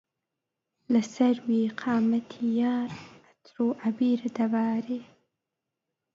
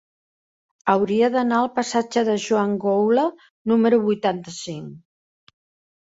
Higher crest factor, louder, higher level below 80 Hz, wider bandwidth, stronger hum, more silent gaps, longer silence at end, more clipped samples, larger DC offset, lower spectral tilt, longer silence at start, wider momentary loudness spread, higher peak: about the same, 18 dB vs 18 dB; second, -27 LUFS vs -21 LUFS; second, -74 dBFS vs -66 dBFS; about the same, 7.4 kHz vs 8 kHz; neither; second, none vs 3.50-3.65 s; about the same, 1.1 s vs 1.05 s; neither; neither; about the same, -6.5 dB/octave vs -5.5 dB/octave; about the same, 0.9 s vs 0.85 s; second, 6 LU vs 13 LU; second, -12 dBFS vs -4 dBFS